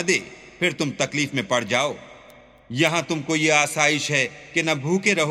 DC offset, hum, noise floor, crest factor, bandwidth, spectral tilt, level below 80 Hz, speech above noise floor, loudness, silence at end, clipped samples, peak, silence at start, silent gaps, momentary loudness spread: under 0.1%; none; -49 dBFS; 20 dB; 16 kHz; -3.5 dB/octave; -62 dBFS; 26 dB; -21 LUFS; 0 s; under 0.1%; -2 dBFS; 0 s; none; 6 LU